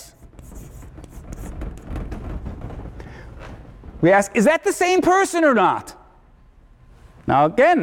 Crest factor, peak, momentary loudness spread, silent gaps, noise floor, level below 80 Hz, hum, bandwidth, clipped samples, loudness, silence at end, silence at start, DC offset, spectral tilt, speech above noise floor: 14 dB; -6 dBFS; 25 LU; none; -50 dBFS; -38 dBFS; none; 17.5 kHz; under 0.1%; -17 LUFS; 0 s; 0 s; under 0.1%; -5 dB/octave; 34 dB